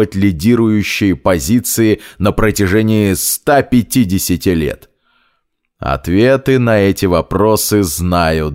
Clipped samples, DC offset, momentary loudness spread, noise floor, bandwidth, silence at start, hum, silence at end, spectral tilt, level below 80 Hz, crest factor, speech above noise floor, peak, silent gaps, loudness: under 0.1%; under 0.1%; 4 LU; -65 dBFS; 16.5 kHz; 0 s; none; 0 s; -5.5 dB/octave; -32 dBFS; 12 dB; 53 dB; 0 dBFS; none; -13 LUFS